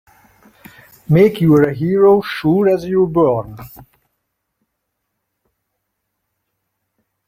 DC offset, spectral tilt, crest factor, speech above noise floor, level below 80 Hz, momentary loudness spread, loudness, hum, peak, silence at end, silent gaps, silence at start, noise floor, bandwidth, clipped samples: under 0.1%; -8.5 dB/octave; 16 dB; 61 dB; -50 dBFS; 7 LU; -14 LUFS; none; -2 dBFS; 3.6 s; none; 1.1 s; -74 dBFS; 16 kHz; under 0.1%